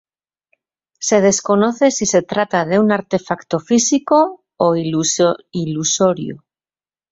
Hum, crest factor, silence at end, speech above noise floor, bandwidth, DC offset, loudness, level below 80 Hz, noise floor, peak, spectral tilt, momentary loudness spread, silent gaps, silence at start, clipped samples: none; 16 dB; 0.75 s; over 74 dB; 8 kHz; under 0.1%; -16 LUFS; -56 dBFS; under -90 dBFS; -2 dBFS; -4 dB/octave; 8 LU; none; 1 s; under 0.1%